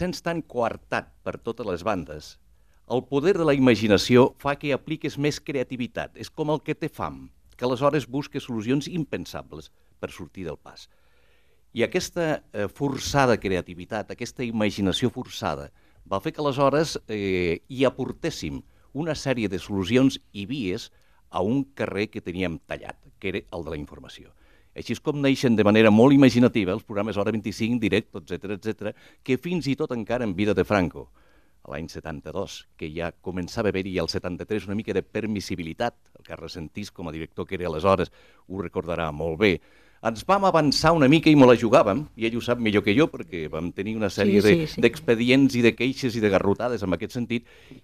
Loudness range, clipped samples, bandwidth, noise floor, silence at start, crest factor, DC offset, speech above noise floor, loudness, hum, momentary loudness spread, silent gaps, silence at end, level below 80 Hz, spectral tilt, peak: 10 LU; under 0.1%; 15 kHz; -64 dBFS; 0 s; 20 dB; 0.1%; 40 dB; -24 LUFS; none; 17 LU; none; 0.1 s; -52 dBFS; -6 dB/octave; -4 dBFS